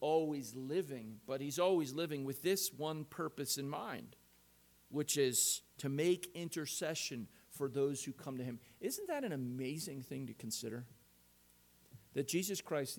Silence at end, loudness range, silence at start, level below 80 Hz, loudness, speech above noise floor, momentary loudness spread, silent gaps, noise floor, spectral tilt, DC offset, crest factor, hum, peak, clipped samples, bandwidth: 0 s; 6 LU; 0 s; -78 dBFS; -39 LUFS; 29 dB; 12 LU; none; -68 dBFS; -4 dB/octave; under 0.1%; 18 dB; 60 Hz at -70 dBFS; -22 dBFS; under 0.1%; 19 kHz